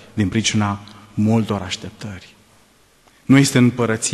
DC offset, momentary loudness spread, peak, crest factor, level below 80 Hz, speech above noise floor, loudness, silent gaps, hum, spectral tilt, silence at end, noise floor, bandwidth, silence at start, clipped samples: under 0.1%; 20 LU; -2 dBFS; 18 dB; -52 dBFS; 36 dB; -18 LUFS; none; none; -5 dB/octave; 0 s; -54 dBFS; 13 kHz; 0.15 s; under 0.1%